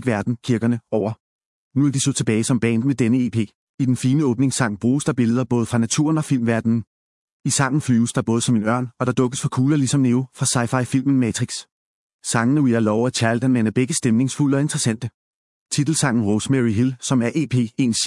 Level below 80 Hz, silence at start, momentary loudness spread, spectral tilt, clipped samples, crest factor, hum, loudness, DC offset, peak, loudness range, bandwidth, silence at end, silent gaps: -60 dBFS; 0 s; 5 LU; -5.5 dB/octave; under 0.1%; 18 dB; none; -20 LUFS; under 0.1%; -2 dBFS; 1 LU; 12 kHz; 0 s; 1.20-1.39 s, 1.45-1.71 s, 3.55-3.78 s, 6.87-7.40 s, 11.72-12.19 s, 15.14-15.66 s